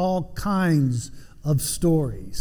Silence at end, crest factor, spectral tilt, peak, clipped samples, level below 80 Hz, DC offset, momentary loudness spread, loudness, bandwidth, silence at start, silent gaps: 0 s; 12 dB; -6 dB/octave; -10 dBFS; under 0.1%; -40 dBFS; under 0.1%; 10 LU; -23 LUFS; 18 kHz; 0 s; none